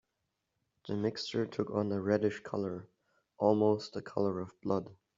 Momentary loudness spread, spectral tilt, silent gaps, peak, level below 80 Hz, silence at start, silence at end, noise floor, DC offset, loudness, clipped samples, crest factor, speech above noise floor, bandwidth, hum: 10 LU; -6 dB/octave; none; -12 dBFS; -74 dBFS; 0.85 s; 0.25 s; -84 dBFS; under 0.1%; -34 LUFS; under 0.1%; 22 dB; 51 dB; 7.6 kHz; none